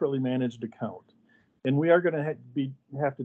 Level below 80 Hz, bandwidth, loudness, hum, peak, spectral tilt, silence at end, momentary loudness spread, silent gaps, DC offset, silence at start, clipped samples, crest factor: -80 dBFS; 7.2 kHz; -28 LUFS; none; -8 dBFS; -9 dB/octave; 0 s; 13 LU; none; under 0.1%; 0 s; under 0.1%; 20 dB